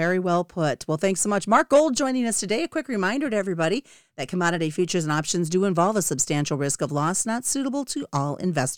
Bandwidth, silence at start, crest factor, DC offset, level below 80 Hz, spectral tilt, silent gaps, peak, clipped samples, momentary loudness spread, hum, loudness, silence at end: 19 kHz; 0 s; 18 dB; 0.3%; -60 dBFS; -4.5 dB/octave; none; -4 dBFS; under 0.1%; 7 LU; none; -23 LUFS; 0 s